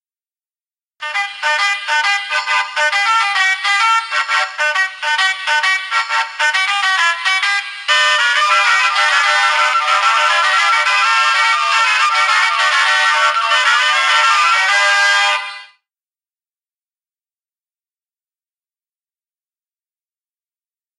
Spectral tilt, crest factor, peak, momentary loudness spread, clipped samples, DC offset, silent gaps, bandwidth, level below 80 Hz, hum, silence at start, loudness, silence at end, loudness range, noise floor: 5.5 dB/octave; 16 dB; 0 dBFS; 5 LU; under 0.1%; under 0.1%; none; 13.5 kHz; -78 dBFS; none; 1 s; -13 LUFS; 5.35 s; 4 LU; under -90 dBFS